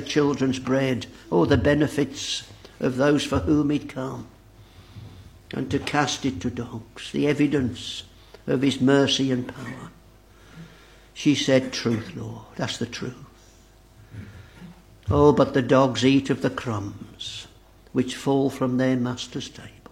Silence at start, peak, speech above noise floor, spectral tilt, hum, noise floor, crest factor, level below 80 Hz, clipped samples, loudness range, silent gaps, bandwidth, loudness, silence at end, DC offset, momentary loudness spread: 0 s; -4 dBFS; 29 dB; -5.5 dB/octave; none; -52 dBFS; 22 dB; -48 dBFS; under 0.1%; 6 LU; none; 13.5 kHz; -23 LUFS; 0.2 s; under 0.1%; 19 LU